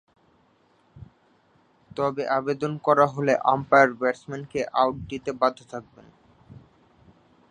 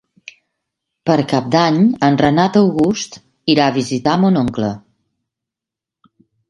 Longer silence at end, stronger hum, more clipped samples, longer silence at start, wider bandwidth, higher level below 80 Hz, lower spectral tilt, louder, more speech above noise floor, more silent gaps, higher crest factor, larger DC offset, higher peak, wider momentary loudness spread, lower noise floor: second, 1 s vs 1.7 s; neither; neither; about the same, 0.95 s vs 1.05 s; second, 10 kHz vs 11.5 kHz; second, -60 dBFS vs -50 dBFS; about the same, -6 dB/octave vs -6 dB/octave; second, -23 LUFS vs -15 LUFS; second, 39 dB vs 72 dB; neither; first, 24 dB vs 16 dB; neither; about the same, -2 dBFS vs 0 dBFS; first, 15 LU vs 11 LU; second, -63 dBFS vs -86 dBFS